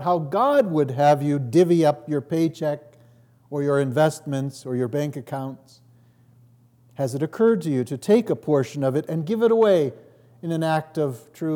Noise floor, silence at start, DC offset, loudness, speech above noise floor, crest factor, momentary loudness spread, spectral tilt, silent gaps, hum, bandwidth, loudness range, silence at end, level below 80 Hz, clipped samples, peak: -55 dBFS; 0 s; under 0.1%; -22 LUFS; 34 dB; 16 dB; 11 LU; -7 dB/octave; none; none; 18 kHz; 6 LU; 0 s; -76 dBFS; under 0.1%; -6 dBFS